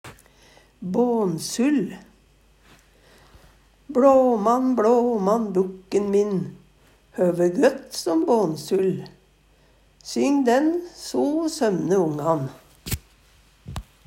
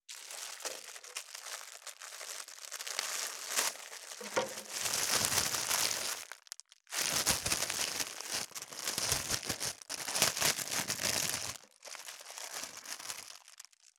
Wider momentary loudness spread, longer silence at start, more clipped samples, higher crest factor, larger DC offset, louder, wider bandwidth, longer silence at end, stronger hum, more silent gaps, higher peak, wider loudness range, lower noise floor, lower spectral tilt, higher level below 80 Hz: about the same, 14 LU vs 15 LU; about the same, 0.05 s vs 0.1 s; neither; second, 18 dB vs 32 dB; neither; first, -22 LUFS vs -34 LUFS; second, 16 kHz vs over 20 kHz; about the same, 0.25 s vs 0.35 s; neither; neither; about the same, -4 dBFS vs -4 dBFS; about the same, 5 LU vs 6 LU; about the same, -57 dBFS vs -58 dBFS; first, -6 dB/octave vs 0 dB/octave; first, -52 dBFS vs -66 dBFS